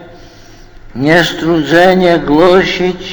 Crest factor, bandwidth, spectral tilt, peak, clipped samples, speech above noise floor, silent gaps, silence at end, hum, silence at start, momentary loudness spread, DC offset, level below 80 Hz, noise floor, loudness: 10 dB; 20 kHz; -5.5 dB/octave; 0 dBFS; 0.4%; 26 dB; none; 0 s; none; 0 s; 8 LU; under 0.1%; -34 dBFS; -35 dBFS; -9 LUFS